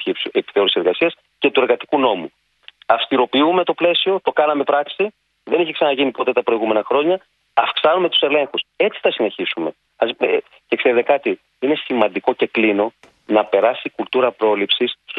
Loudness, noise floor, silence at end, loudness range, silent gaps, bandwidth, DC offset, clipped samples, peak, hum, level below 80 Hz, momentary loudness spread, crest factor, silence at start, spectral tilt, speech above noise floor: -18 LUFS; -48 dBFS; 0 s; 2 LU; none; 4.9 kHz; under 0.1%; under 0.1%; 0 dBFS; none; -68 dBFS; 7 LU; 18 dB; 0 s; -7 dB/octave; 30 dB